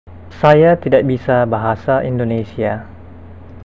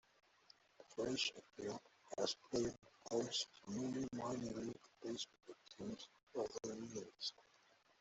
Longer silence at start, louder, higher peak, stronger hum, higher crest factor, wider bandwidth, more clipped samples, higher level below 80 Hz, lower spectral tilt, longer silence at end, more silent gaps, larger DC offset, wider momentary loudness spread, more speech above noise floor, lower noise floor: second, 0.05 s vs 0.8 s; first, -15 LUFS vs -46 LUFS; first, 0 dBFS vs -24 dBFS; neither; second, 16 dB vs 22 dB; second, 7.4 kHz vs 8.2 kHz; neither; first, -40 dBFS vs -76 dBFS; first, -9 dB/octave vs -3.5 dB/octave; second, 0.05 s vs 0.6 s; second, none vs 6.23-6.27 s; first, 0.8% vs under 0.1%; about the same, 10 LU vs 12 LU; second, 22 dB vs 28 dB; second, -36 dBFS vs -73 dBFS